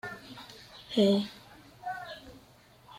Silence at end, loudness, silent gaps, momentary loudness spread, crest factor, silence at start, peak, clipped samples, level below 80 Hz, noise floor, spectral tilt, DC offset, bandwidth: 0 s; -30 LUFS; none; 23 LU; 20 dB; 0.05 s; -14 dBFS; under 0.1%; -66 dBFS; -58 dBFS; -6 dB/octave; under 0.1%; 15.5 kHz